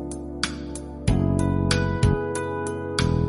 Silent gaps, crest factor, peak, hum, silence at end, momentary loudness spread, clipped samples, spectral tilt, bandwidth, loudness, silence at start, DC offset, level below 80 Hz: none; 16 dB; -6 dBFS; none; 0 s; 8 LU; under 0.1%; -5.5 dB/octave; 11.5 kHz; -25 LUFS; 0 s; under 0.1%; -32 dBFS